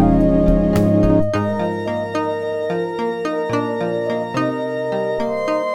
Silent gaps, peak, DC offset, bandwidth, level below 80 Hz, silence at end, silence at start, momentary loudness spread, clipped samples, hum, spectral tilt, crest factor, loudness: none; -2 dBFS; under 0.1%; 16.5 kHz; -30 dBFS; 0 s; 0 s; 7 LU; under 0.1%; none; -8 dB/octave; 16 dB; -19 LUFS